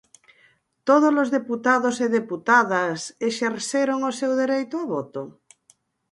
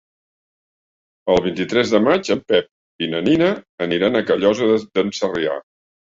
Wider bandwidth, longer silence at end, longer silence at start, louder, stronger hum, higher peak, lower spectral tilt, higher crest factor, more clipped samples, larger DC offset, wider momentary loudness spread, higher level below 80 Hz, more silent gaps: first, 11.5 kHz vs 7.8 kHz; first, 0.8 s vs 0.5 s; second, 0.85 s vs 1.25 s; second, -22 LUFS vs -19 LUFS; neither; about the same, -4 dBFS vs -2 dBFS; second, -4 dB/octave vs -5.5 dB/octave; about the same, 20 dB vs 18 dB; neither; neither; first, 11 LU vs 8 LU; second, -74 dBFS vs -52 dBFS; second, none vs 2.71-2.99 s, 3.69-3.78 s